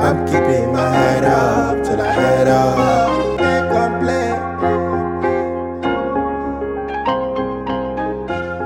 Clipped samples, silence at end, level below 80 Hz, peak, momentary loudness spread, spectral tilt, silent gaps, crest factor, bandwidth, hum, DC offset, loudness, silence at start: under 0.1%; 0 s; -38 dBFS; 0 dBFS; 8 LU; -6.5 dB/octave; none; 16 dB; 16.5 kHz; none; under 0.1%; -17 LUFS; 0 s